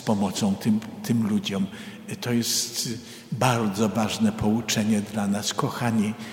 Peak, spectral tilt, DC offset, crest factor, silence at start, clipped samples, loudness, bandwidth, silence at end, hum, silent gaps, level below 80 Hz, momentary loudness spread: -6 dBFS; -4.5 dB/octave; under 0.1%; 18 dB; 0 s; under 0.1%; -25 LUFS; 16.5 kHz; 0 s; none; none; -56 dBFS; 8 LU